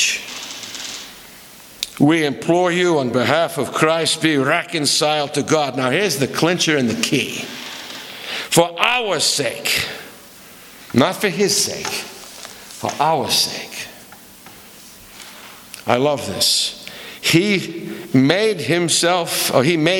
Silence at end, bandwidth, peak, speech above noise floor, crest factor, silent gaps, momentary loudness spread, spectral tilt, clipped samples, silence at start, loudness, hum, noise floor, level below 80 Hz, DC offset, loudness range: 0 s; 19.5 kHz; 0 dBFS; 24 dB; 20 dB; none; 18 LU; -3.5 dB/octave; under 0.1%; 0 s; -17 LUFS; none; -41 dBFS; -58 dBFS; under 0.1%; 5 LU